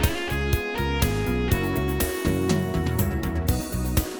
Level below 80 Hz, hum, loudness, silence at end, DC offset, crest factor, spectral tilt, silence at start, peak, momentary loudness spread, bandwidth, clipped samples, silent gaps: -32 dBFS; none; -25 LUFS; 0 s; under 0.1%; 18 dB; -5.5 dB/octave; 0 s; -6 dBFS; 2 LU; over 20 kHz; under 0.1%; none